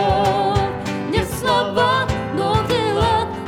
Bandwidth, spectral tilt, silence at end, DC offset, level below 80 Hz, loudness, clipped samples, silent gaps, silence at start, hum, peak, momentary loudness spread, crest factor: 18.5 kHz; -5.5 dB/octave; 0 s; under 0.1%; -34 dBFS; -19 LUFS; under 0.1%; none; 0 s; none; -4 dBFS; 5 LU; 16 dB